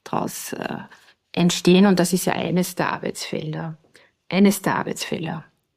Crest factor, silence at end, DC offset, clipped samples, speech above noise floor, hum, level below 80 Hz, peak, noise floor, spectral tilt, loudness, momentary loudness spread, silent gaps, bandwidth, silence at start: 20 dB; 0.35 s; under 0.1%; under 0.1%; 24 dB; none; -64 dBFS; -2 dBFS; -45 dBFS; -5 dB/octave; -21 LUFS; 15 LU; none; 15.5 kHz; 0.05 s